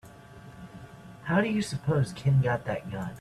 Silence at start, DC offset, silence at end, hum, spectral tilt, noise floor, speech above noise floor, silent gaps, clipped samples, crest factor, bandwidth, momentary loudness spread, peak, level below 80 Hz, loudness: 0.05 s; under 0.1%; 0 s; none; -7 dB/octave; -48 dBFS; 21 dB; none; under 0.1%; 18 dB; 12.5 kHz; 22 LU; -12 dBFS; -56 dBFS; -28 LUFS